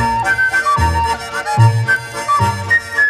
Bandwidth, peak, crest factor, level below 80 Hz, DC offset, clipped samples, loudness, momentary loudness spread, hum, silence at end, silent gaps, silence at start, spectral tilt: 14 kHz; 0 dBFS; 14 dB; -30 dBFS; under 0.1%; under 0.1%; -14 LUFS; 5 LU; none; 0 s; none; 0 s; -4.5 dB/octave